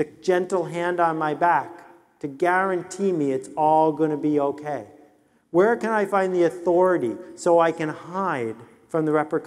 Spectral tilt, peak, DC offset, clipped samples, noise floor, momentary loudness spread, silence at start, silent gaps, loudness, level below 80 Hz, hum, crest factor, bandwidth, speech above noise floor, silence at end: -6.5 dB/octave; -6 dBFS; under 0.1%; under 0.1%; -58 dBFS; 10 LU; 0 s; none; -22 LUFS; -72 dBFS; none; 16 dB; 12 kHz; 36 dB; 0 s